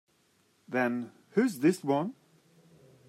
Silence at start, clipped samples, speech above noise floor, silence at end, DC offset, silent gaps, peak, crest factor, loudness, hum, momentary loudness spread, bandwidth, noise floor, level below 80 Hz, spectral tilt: 0.7 s; under 0.1%; 41 dB; 0.95 s; under 0.1%; none; -14 dBFS; 20 dB; -30 LUFS; none; 10 LU; 16 kHz; -69 dBFS; -82 dBFS; -6.5 dB/octave